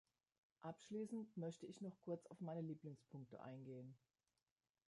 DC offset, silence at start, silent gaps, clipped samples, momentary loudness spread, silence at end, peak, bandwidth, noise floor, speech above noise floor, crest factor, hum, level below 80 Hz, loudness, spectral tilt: under 0.1%; 0.6 s; none; under 0.1%; 9 LU; 0.9 s; -38 dBFS; 11 kHz; under -90 dBFS; over 37 dB; 16 dB; none; under -90 dBFS; -54 LUFS; -7.5 dB/octave